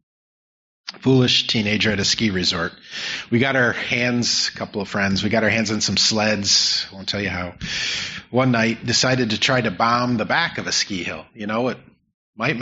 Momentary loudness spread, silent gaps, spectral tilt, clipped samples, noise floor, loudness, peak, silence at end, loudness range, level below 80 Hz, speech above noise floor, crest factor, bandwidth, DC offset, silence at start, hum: 10 LU; 12.14-12.33 s; -2.5 dB/octave; under 0.1%; under -90 dBFS; -19 LUFS; -4 dBFS; 0 s; 2 LU; -54 dBFS; over 70 dB; 16 dB; 8 kHz; under 0.1%; 0.85 s; none